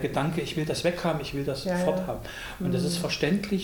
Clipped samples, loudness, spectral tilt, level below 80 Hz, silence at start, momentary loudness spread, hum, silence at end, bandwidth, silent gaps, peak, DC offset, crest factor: under 0.1%; -28 LUFS; -5.5 dB/octave; -48 dBFS; 0 s; 6 LU; none; 0 s; 19.5 kHz; none; -10 dBFS; under 0.1%; 18 dB